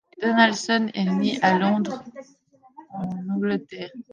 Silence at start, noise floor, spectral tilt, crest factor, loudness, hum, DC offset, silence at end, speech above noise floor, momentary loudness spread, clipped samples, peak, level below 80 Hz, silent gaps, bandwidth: 0.2 s; -50 dBFS; -5 dB/octave; 20 dB; -22 LUFS; none; under 0.1%; 0.1 s; 27 dB; 18 LU; under 0.1%; -4 dBFS; -68 dBFS; none; 9.6 kHz